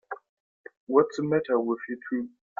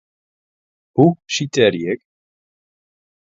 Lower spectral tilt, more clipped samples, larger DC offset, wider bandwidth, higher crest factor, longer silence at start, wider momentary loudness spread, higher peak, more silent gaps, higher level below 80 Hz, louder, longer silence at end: first, -7.5 dB/octave vs -5.5 dB/octave; neither; neither; about the same, 7.4 kHz vs 7.8 kHz; about the same, 20 dB vs 20 dB; second, 0.1 s vs 0.95 s; first, 18 LU vs 10 LU; second, -8 dBFS vs 0 dBFS; first, 0.29-0.64 s, 0.77-0.87 s vs none; second, -72 dBFS vs -60 dBFS; second, -27 LUFS vs -17 LUFS; second, 0.3 s vs 1.3 s